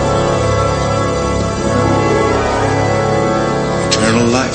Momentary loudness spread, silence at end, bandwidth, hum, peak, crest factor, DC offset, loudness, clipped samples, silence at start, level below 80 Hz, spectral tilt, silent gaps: 3 LU; 0 s; 8.8 kHz; none; 0 dBFS; 14 dB; under 0.1%; -14 LUFS; under 0.1%; 0 s; -28 dBFS; -5 dB/octave; none